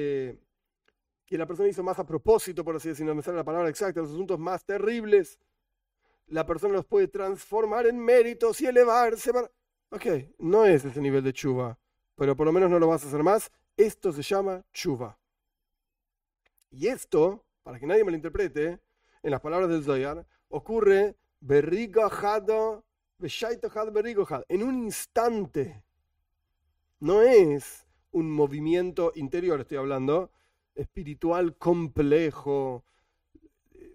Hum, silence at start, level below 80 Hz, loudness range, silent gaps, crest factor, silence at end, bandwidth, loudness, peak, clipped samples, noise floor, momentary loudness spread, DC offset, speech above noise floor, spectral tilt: none; 0 s; -54 dBFS; 6 LU; none; 18 dB; 0.05 s; 16 kHz; -26 LUFS; -8 dBFS; under 0.1%; -86 dBFS; 14 LU; under 0.1%; 61 dB; -6 dB/octave